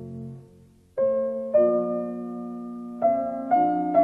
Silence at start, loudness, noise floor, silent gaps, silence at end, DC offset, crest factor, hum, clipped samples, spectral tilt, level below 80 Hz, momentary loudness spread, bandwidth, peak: 0 s; -25 LUFS; -54 dBFS; none; 0 s; under 0.1%; 16 dB; none; under 0.1%; -10 dB/octave; -64 dBFS; 15 LU; 3.6 kHz; -8 dBFS